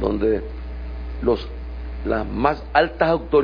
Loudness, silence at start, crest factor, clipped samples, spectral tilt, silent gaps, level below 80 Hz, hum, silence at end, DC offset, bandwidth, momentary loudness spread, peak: -22 LUFS; 0 s; 20 dB; under 0.1%; -8.5 dB/octave; none; -32 dBFS; none; 0 s; under 0.1%; 5.2 kHz; 15 LU; -2 dBFS